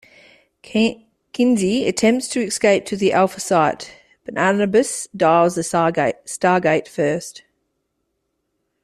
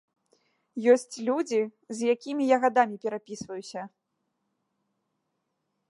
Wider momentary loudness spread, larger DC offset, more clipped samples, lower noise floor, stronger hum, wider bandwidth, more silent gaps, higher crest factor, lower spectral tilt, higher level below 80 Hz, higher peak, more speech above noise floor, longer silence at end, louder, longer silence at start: second, 9 LU vs 16 LU; neither; neither; second, -73 dBFS vs -80 dBFS; neither; first, 14 kHz vs 11.5 kHz; neither; about the same, 18 dB vs 22 dB; about the same, -4.5 dB/octave vs -4.5 dB/octave; first, -58 dBFS vs -78 dBFS; first, -2 dBFS vs -8 dBFS; about the same, 55 dB vs 53 dB; second, 1.45 s vs 2.05 s; first, -18 LUFS vs -27 LUFS; about the same, 0.7 s vs 0.75 s